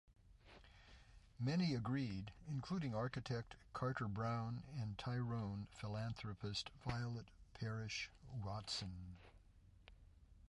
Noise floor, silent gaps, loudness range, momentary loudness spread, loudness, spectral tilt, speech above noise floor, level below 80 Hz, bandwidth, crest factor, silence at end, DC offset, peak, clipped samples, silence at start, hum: -67 dBFS; none; 4 LU; 21 LU; -45 LUFS; -6 dB/octave; 22 dB; -64 dBFS; 11.5 kHz; 18 dB; 0.05 s; under 0.1%; -28 dBFS; under 0.1%; 0.1 s; none